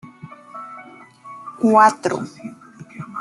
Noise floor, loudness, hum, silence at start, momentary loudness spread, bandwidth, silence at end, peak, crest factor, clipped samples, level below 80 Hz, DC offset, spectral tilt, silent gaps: -42 dBFS; -16 LUFS; none; 0.05 s; 27 LU; 12 kHz; 0 s; -2 dBFS; 20 dB; under 0.1%; -68 dBFS; under 0.1%; -5.5 dB/octave; none